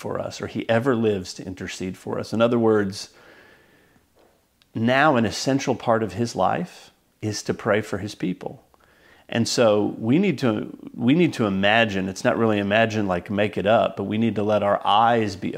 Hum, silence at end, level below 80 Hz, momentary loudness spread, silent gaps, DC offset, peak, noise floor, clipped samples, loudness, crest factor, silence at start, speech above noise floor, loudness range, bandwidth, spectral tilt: none; 0 s; -62 dBFS; 12 LU; none; under 0.1%; -2 dBFS; -61 dBFS; under 0.1%; -22 LUFS; 20 dB; 0 s; 39 dB; 5 LU; 15.5 kHz; -5.5 dB/octave